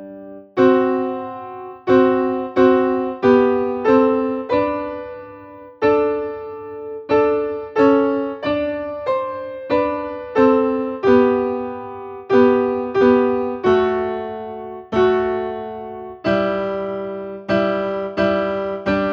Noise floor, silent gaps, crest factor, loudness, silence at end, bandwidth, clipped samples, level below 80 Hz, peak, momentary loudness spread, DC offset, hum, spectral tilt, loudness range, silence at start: -39 dBFS; none; 18 dB; -18 LUFS; 0 s; 6.4 kHz; under 0.1%; -50 dBFS; -2 dBFS; 16 LU; under 0.1%; none; -7.5 dB/octave; 5 LU; 0 s